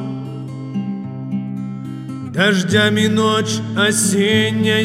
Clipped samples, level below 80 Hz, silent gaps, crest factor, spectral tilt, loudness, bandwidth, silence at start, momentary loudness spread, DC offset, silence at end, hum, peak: under 0.1%; -60 dBFS; none; 18 dB; -4 dB/octave; -17 LUFS; 16 kHz; 0 s; 14 LU; under 0.1%; 0 s; none; 0 dBFS